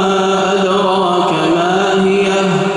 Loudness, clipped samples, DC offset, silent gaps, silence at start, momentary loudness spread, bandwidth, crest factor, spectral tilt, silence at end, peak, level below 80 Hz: -13 LUFS; under 0.1%; under 0.1%; none; 0 s; 1 LU; 11.5 kHz; 10 dB; -5 dB/octave; 0 s; -2 dBFS; -52 dBFS